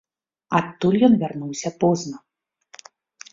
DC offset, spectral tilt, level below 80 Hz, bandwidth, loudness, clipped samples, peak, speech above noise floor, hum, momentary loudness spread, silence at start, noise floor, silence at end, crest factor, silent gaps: under 0.1%; -6 dB/octave; -60 dBFS; 7.8 kHz; -21 LUFS; under 0.1%; -4 dBFS; 33 dB; none; 13 LU; 0.5 s; -53 dBFS; 1.15 s; 18 dB; none